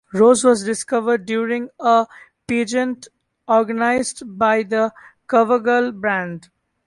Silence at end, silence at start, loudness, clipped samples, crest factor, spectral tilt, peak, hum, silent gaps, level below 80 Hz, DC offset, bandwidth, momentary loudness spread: 0.45 s; 0.15 s; -18 LUFS; under 0.1%; 16 dB; -4 dB/octave; -2 dBFS; none; none; -60 dBFS; under 0.1%; 11.5 kHz; 9 LU